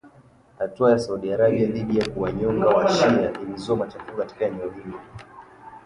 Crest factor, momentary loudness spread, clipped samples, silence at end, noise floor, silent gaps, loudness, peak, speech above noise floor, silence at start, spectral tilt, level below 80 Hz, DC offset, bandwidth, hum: 18 dB; 16 LU; under 0.1%; 0.1 s; -53 dBFS; none; -23 LUFS; -6 dBFS; 31 dB; 0.05 s; -6.5 dB/octave; -52 dBFS; under 0.1%; 11 kHz; none